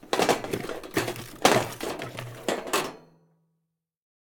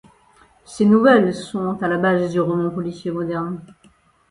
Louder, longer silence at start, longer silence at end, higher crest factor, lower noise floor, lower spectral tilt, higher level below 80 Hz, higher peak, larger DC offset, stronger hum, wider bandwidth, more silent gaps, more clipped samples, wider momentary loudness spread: second, -28 LUFS vs -19 LUFS; second, 0.05 s vs 0.7 s; first, 1.25 s vs 0.65 s; first, 28 dB vs 18 dB; first, -80 dBFS vs -55 dBFS; second, -3.5 dB/octave vs -7 dB/octave; about the same, -58 dBFS vs -56 dBFS; about the same, -2 dBFS vs 0 dBFS; neither; neither; first, 19.5 kHz vs 11 kHz; neither; neither; about the same, 12 LU vs 13 LU